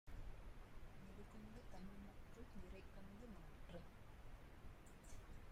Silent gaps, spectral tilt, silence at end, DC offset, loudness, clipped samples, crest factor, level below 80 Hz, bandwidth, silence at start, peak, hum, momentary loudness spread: none; -6 dB/octave; 0 s; under 0.1%; -61 LUFS; under 0.1%; 14 dB; -60 dBFS; 15.5 kHz; 0.05 s; -42 dBFS; none; 4 LU